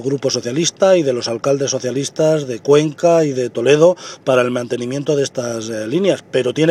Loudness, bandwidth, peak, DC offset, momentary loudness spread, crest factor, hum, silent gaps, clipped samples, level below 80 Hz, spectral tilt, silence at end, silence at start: -16 LUFS; 13 kHz; 0 dBFS; under 0.1%; 8 LU; 16 dB; none; none; under 0.1%; -64 dBFS; -5 dB/octave; 0 s; 0 s